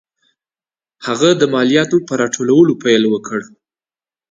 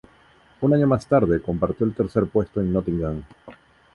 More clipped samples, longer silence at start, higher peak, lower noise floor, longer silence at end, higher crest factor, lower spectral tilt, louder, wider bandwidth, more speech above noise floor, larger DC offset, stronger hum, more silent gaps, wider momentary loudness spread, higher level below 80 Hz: neither; first, 1 s vs 0.6 s; first, 0 dBFS vs -6 dBFS; first, under -90 dBFS vs -55 dBFS; first, 0.9 s vs 0.4 s; about the same, 16 dB vs 16 dB; second, -4.5 dB/octave vs -9.5 dB/octave; first, -14 LUFS vs -22 LUFS; second, 9.2 kHz vs 11.5 kHz; first, over 77 dB vs 33 dB; neither; neither; neither; first, 12 LU vs 7 LU; second, -60 dBFS vs -42 dBFS